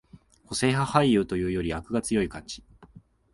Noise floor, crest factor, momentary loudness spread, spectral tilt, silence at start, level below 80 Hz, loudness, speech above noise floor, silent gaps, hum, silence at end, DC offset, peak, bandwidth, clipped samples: -53 dBFS; 22 dB; 16 LU; -5.5 dB/octave; 0.5 s; -48 dBFS; -26 LUFS; 28 dB; none; none; 0.35 s; under 0.1%; -6 dBFS; 11.5 kHz; under 0.1%